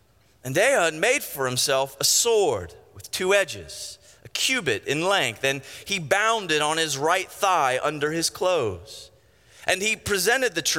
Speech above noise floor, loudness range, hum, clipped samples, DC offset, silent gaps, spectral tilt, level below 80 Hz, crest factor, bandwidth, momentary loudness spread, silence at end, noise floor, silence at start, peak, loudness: 31 dB; 2 LU; none; under 0.1%; under 0.1%; none; -2 dB/octave; -60 dBFS; 18 dB; 17 kHz; 13 LU; 0 s; -54 dBFS; 0.45 s; -6 dBFS; -23 LUFS